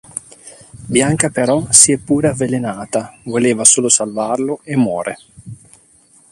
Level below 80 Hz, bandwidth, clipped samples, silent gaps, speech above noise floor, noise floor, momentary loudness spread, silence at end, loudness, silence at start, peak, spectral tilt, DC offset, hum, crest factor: -48 dBFS; 16 kHz; 0.1%; none; 35 dB; -50 dBFS; 14 LU; 0.75 s; -14 LUFS; 0.15 s; 0 dBFS; -3.5 dB/octave; under 0.1%; none; 16 dB